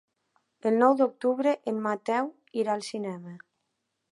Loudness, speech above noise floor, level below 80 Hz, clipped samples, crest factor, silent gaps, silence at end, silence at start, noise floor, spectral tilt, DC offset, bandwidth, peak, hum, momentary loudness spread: -27 LUFS; 53 dB; -84 dBFS; under 0.1%; 20 dB; none; 0.75 s; 0.65 s; -80 dBFS; -6 dB/octave; under 0.1%; 11.5 kHz; -8 dBFS; none; 13 LU